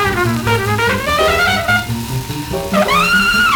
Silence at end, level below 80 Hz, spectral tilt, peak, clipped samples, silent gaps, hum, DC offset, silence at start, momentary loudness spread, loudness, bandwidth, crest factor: 0 s; -32 dBFS; -4 dB/octave; -2 dBFS; under 0.1%; none; none; under 0.1%; 0 s; 10 LU; -14 LUFS; over 20 kHz; 12 dB